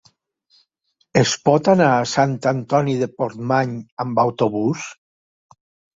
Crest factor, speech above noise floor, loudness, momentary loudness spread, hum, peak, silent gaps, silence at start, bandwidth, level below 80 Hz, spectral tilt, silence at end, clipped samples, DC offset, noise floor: 18 dB; 49 dB; -19 LUFS; 10 LU; none; -2 dBFS; 3.92-3.97 s; 1.15 s; 7.8 kHz; -58 dBFS; -5.5 dB/octave; 1 s; under 0.1%; under 0.1%; -68 dBFS